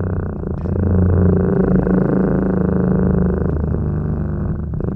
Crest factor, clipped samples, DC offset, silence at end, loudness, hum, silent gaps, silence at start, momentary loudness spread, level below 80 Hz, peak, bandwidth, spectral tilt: 12 dB; under 0.1%; under 0.1%; 0 s; -17 LUFS; none; none; 0 s; 8 LU; -26 dBFS; -4 dBFS; 2.7 kHz; -13 dB/octave